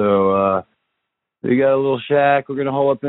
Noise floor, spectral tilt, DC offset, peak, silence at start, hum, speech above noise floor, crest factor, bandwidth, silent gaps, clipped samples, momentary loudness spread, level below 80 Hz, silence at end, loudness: -78 dBFS; -5.5 dB/octave; under 0.1%; -4 dBFS; 0 s; none; 61 dB; 14 dB; 4.1 kHz; none; under 0.1%; 7 LU; -60 dBFS; 0 s; -17 LUFS